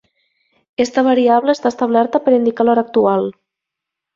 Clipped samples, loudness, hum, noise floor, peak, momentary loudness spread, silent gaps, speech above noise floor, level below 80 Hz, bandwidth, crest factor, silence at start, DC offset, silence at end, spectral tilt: under 0.1%; -15 LUFS; none; -82 dBFS; -2 dBFS; 7 LU; none; 68 dB; -60 dBFS; 7.6 kHz; 14 dB; 0.8 s; under 0.1%; 0.85 s; -5.5 dB/octave